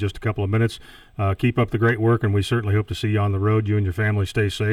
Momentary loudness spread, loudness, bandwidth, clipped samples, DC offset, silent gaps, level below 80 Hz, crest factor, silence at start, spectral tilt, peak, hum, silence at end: 6 LU; -22 LUFS; 11 kHz; under 0.1%; under 0.1%; none; -44 dBFS; 14 dB; 0 s; -7 dB/octave; -6 dBFS; none; 0 s